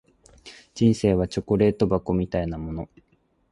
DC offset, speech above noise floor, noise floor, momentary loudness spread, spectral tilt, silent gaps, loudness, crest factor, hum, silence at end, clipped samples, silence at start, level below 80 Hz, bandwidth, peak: under 0.1%; 27 dB; -49 dBFS; 14 LU; -7.5 dB/octave; none; -23 LUFS; 18 dB; none; 0.65 s; under 0.1%; 0.45 s; -42 dBFS; 11.5 kHz; -6 dBFS